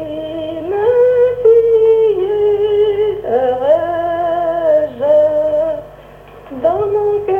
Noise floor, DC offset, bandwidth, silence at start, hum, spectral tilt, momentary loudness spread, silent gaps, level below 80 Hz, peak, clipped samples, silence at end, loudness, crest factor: -37 dBFS; under 0.1%; 3.7 kHz; 0 s; none; -7.5 dB/octave; 10 LU; none; -46 dBFS; -2 dBFS; under 0.1%; 0 s; -14 LUFS; 12 dB